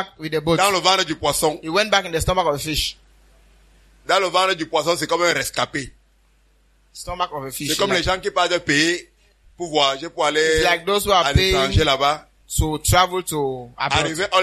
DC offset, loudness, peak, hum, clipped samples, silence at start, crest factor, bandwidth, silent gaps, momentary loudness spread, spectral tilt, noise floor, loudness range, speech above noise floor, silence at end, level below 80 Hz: under 0.1%; -19 LUFS; -2 dBFS; none; under 0.1%; 0 s; 20 dB; 13.5 kHz; none; 9 LU; -3.5 dB/octave; -58 dBFS; 5 LU; 38 dB; 0 s; -36 dBFS